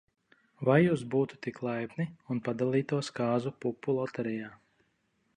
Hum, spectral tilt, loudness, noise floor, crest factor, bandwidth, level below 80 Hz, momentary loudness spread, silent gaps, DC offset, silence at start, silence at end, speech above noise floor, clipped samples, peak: none; -7.5 dB/octave; -31 LUFS; -75 dBFS; 20 dB; 10.5 kHz; -70 dBFS; 11 LU; none; under 0.1%; 0.6 s; 0.8 s; 44 dB; under 0.1%; -10 dBFS